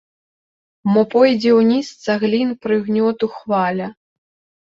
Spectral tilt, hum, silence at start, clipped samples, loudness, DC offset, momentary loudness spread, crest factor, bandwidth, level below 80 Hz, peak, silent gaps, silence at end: -6.5 dB/octave; none; 0.85 s; under 0.1%; -17 LUFS; under 0.1%; 10 LU; 16 dB; 7.6 kHz; -62 dBFS; -2 dBFS; none; 0.75 s